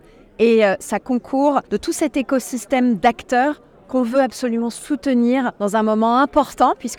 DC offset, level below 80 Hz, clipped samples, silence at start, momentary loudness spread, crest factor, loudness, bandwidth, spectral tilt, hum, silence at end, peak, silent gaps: under 0.1%; -50 dBFS; under 0.1%; 0.4 s; 7 LU; 16 dB; -18 LUFS; 17 kHz; -4.5 dB/octave; none; 0.05 s; -2 dBFS; none